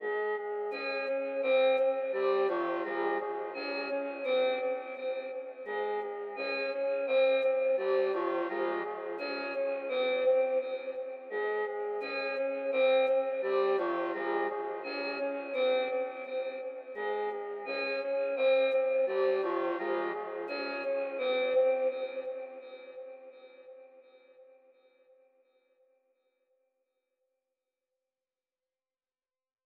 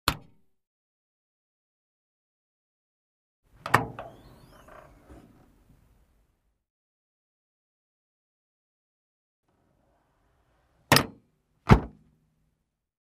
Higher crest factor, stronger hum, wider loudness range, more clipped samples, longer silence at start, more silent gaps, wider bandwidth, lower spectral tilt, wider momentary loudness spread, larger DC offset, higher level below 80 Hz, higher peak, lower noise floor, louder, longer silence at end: second, 14 dB vs 32 dB; neither; second, 4 LU vs 7 LU; neither; about the same, 0 s vs 0.05 s; second, none vs 0.67-3.43 s, 6.70-9.43 s; second, 5 kHz vs 15.5 kHz; first, -6 dB/octave vs -4.5 dB/octave; second, 11 LU vs 22 LU; neither; second, under -90 dBFS vs -44 dBFS; second, -18 dBFS vs -2 dBFS; first, under -90 dBFS vs -78 dBFS; second, -32 LUFS vs -24 LUFS; first, 5.2 s vs 1.15 s